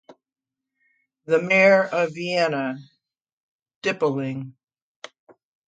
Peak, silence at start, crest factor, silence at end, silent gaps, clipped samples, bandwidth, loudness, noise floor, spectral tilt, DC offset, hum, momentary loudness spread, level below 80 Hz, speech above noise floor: -6 dBFS; 0.1 s; 20 dB; 1.15 s; 3.33-3.66 s, 3.76-3.81 s; under 0.1%; 9 kHz; -21 LUFS; -88 dBFS; -5.5 dB/octave; under 0.1%; none; 20 LU; -74 dBFS; 67 dB